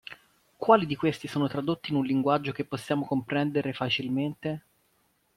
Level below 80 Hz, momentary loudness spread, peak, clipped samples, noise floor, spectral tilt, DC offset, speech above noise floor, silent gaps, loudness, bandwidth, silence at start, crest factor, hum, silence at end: -66 dBFS; 11 LU; -6 dBFS; under 0.1%; -70 dBFS; -6.5 dB/octave; under 0.1%; 43 dB; none; -28 LUFS; 14.5 kHz; 0.1 s; 24 dB; none; 0.8 s